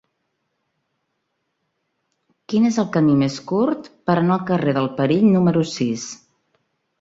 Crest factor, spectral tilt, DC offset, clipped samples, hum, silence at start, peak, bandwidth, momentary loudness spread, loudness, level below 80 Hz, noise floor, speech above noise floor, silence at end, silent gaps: 16 dB; -6.5 dB/octave; under 0.1%; under 0.1%; none; 2.5 s; -4 dBFS; 8 kHz; 9 LU; -19 LUFS; -60 dBFS; -74 dBFS; 56 dB; 0.85 s; none